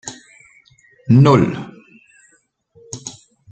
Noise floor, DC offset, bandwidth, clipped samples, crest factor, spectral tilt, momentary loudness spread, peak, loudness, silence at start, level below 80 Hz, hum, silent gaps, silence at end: -59 dBFS; under 0.1%; 8.8 kHz; under 0.1%; 18 dB; -7 dB/octave; 25 LU; -2 dBFS; -13 LUFS; 0.05 s; -52 dBFS; none; none; 0.4 s